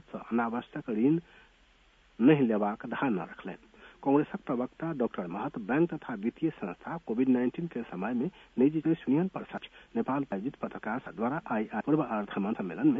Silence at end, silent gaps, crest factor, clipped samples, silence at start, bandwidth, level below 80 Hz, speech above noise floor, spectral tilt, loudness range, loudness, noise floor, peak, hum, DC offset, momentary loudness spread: 0 s; none; 20 dB; under 0.1%; 0.15 s; 3.8 kHz; -66 dBFS; 33 dB; -9.5 dB/octave; 3 LU; -31 LUFS; -63 dBFS; -10 dBFS; none; under 0.1%; 10 LU